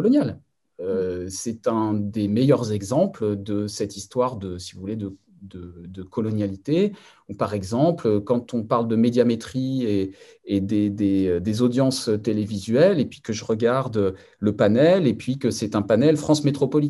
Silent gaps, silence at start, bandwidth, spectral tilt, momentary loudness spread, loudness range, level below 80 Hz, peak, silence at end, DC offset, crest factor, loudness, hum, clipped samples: none; 0 s; 12.5 kHz; -6.5 dB/octave; 13 LU; 7 LU; -62 dBFS; -4 dBFS; 0 s; under 0.1%; 18 dB; -22 LUFS; none; under 0.1%